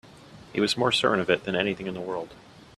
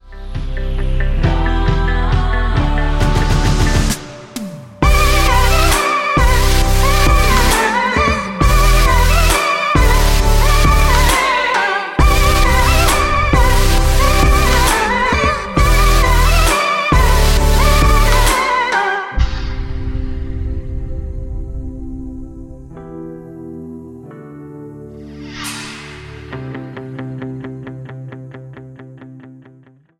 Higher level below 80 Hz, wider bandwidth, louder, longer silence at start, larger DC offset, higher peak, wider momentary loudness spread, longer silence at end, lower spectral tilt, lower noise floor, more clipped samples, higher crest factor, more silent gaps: second, -60 dBFS vs -16 dBFS; second, 14 kHz vs 16.5 kHz; second, -26 LUFS vs -14 LUFS; about the same, 0.05 s vs 0.05 s; neither; second, -6 dBFS vs 0 dBFS; second, 12 LU vs 19 LU; second, 0.15 s vs 0.7 s; about the same, -4 dB/octave vs -4 dB/octave; about the same, -48 dBFS vs -47 dBFS; neither; first, 22 dB vs 14 dB; neither